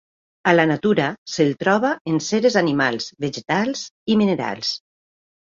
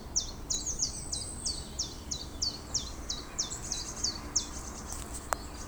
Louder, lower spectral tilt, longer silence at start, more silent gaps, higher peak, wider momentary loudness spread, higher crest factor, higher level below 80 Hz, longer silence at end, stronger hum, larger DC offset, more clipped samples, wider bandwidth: first, -20 LUFS vs -34 LUFS; first, -5 dB/octave vs -1.5 dB/octave; first, 0.45 s vs 0 s; first, 1.18-1.26 s, 2.01-2.05 s, 3.91-4.06 s vs none; first, -2 dBFS vs -8 dBFS; about the same, 9 LU vs 8 LU; second, 18 dB vs 28 dB; second, -60 dBFS vs -46 dBFS; first, 0.7 s vs 0 s; neither; neither; neither; second, 7.6 kHz vs over 20 kHz